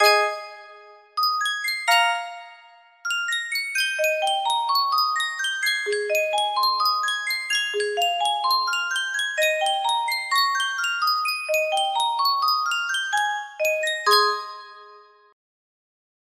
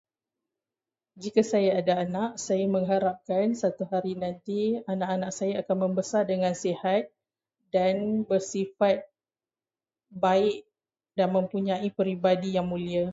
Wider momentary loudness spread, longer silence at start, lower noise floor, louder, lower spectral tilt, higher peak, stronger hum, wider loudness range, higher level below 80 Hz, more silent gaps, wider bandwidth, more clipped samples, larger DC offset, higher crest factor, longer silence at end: about the same, 7 LU vs 6 LU; second, 0 s vs 1.15 s; second, -51 dBFS vs under -90 dBFS; first, -22 LUFS vs -27 LUFS; second, 2.5 dB/octave vs -6 dB/octave; first, -4 dBFS vs -8 dBFS; neither; about the same, 2 LU vs 2 LU; second, -78 dBFS vs -66 dBFS; neither; first, 16 kHz vs 8 kHz; neither; neither; about the same, 20 dB vs 18 dB; first, 1.3 s vs 0 s